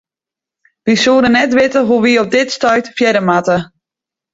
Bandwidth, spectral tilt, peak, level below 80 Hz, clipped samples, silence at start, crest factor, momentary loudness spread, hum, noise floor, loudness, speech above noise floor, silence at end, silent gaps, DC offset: 7.8 kHz; -4.5 dB/octave; -2 dBFS; -50 dBFS; under 0.1%; 0.85 s; 12 dB; 5 LU; none; -87 dBFS; -12 LUFS; 75 dB; 0.7 s; none; under 0.1%